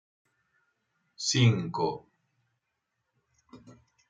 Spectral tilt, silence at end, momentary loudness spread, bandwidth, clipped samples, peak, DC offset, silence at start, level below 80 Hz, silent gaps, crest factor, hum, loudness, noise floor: -4.5 dB/octave; 0.4 s; 9 LU; 9.4 kHz; under 0.1%; -12 dBFS; under 0.1%; 1.2 s; -70 dBFS; none; 22 dB; none; -27 LUFS; -82 dBFS